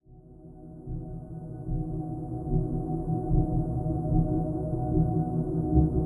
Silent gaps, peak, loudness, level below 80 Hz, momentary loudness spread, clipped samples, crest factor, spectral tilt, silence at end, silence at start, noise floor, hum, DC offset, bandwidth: none; -10 dBFS; -29 LUFS; -36 dBFS; 14 LU; under 0.1%; 18 dB; -13.5 dB/octave; 0 s; 0.1 s; -50 dBFS; none; under 0.1%; 1.6 kHz